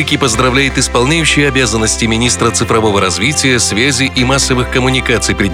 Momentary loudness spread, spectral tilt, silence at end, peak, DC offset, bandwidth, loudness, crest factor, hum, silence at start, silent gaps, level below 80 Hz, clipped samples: 2 LU; -3.5 dB/octave; 0 s; 0 dBFS; under 0.1%; 16.5 kHz; -11 LUFS; 12 dB; none; 0 s; none; -26 dBFS; under 0.1%